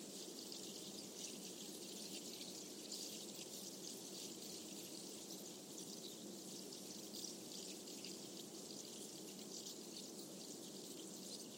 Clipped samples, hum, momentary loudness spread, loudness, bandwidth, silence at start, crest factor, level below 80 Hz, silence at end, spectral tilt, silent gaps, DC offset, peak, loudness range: under 0.1%; none; 3 LU; -50 LUFS; 16.5 kHz; 0 s; 18 dB; under -90 dBFS; 0 s; -2 dB/octave; none; under 0.1%; -34 dBFS; 1 LU